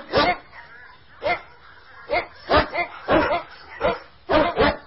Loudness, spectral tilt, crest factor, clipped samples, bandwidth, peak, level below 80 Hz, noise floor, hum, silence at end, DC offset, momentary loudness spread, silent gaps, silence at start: -23 LUFS; -9 dB/octave; 18 dB; under 0.1%; 5.8 kHz; -6 dBFS; -40 dBFS; -48 dBFS; none; 0.05 s; 0.2%; 14 LU; none; 0 s